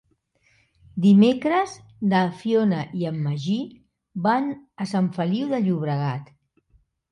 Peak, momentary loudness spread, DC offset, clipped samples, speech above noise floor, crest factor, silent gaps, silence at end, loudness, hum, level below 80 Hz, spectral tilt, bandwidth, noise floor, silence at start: -6 dBFS; 14 LU; under 0.1%; under 0.1%; 43 dB; 18 dB; none; 0.9 s; -23 LUFS; none; -64 dBFS; -7.5 dB/octave; 10 kHz; -65 dBFS; 0.95 s